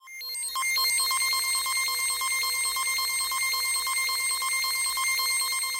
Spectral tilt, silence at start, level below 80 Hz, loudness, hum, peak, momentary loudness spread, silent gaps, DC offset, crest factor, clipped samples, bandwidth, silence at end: 4.5 dB/octave; 0.05 s; -64 dBFS; -24 LUFS; none; -16 dBFS; 3 LU; none; under 0.1%; 12 dB; under 0.1%; 17 kHz; 0 s